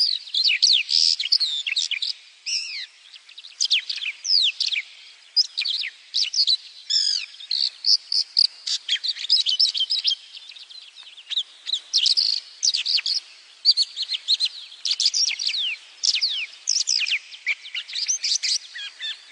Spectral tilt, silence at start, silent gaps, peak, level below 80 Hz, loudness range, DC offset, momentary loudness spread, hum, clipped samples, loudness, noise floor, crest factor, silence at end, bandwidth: 8 dB/octave; 0 s; none; -6 dBFS; under -90 dBFS; 3 LU; under 0.1%; 11 LU; none; under 0.1%; -21 LUFS; -47 dBFS; 18 dB; 0 s; 10.5 kHz